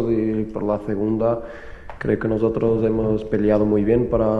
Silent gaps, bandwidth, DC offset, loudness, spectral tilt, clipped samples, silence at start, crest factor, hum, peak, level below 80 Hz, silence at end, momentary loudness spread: none; 6 kHz; under 0.1%; -21 LUFS; -10 dB/octave; under 0.1%; 0 s; 16 dB; none; -4 dBFS; -40 dBFS; 0 s; 10 LU